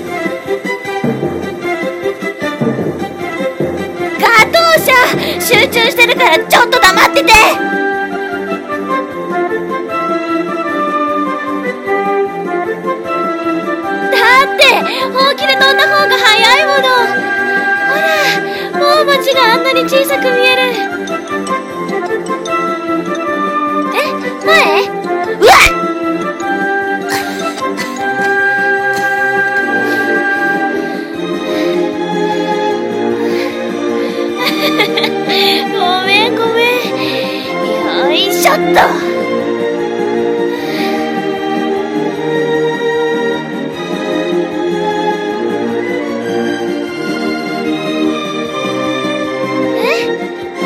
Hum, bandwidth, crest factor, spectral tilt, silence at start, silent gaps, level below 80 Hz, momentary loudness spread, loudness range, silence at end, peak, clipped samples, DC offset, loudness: none; over 20 kHz; 12 dB; -3.5 dB/octave; 0 s; none; -42 dBFS; 11 LU; 8 LU; 0 s; 0 dBFS; 0.7%; under 0.1%; -12 LUFS